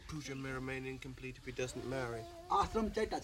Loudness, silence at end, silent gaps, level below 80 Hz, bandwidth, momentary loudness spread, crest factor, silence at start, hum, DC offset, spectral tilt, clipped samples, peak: -40 LUFS; 0 s; none; -54 dBFS; 16 kHz; 12 LU; 20 dB; 0 s; none; under 0.1%; -5 dB/octave; under 0.1%; -20 dBFS